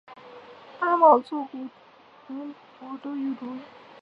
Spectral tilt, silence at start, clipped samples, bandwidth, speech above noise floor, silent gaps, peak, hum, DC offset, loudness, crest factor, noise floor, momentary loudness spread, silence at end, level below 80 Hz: -6.5 dB/octave; 0.1 s; under 0.1%; 5.8 kHz; 27 dB; none; -4 dBFS; none; under 0.1%; -23 LUFS; 22 dB; -52 dBFS; 28 LU; 0.35 s; -84 dBFS